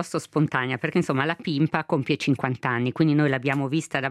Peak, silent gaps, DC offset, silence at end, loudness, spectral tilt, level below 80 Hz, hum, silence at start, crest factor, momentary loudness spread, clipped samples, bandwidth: -4 dBFS; none; under 0.1%; 0 s; -24 LUFS; -6.5 dB/octave; -64 dBFS; none; 0 s; 18 dB; 4 LU; under 0.1%; 12.5 kHz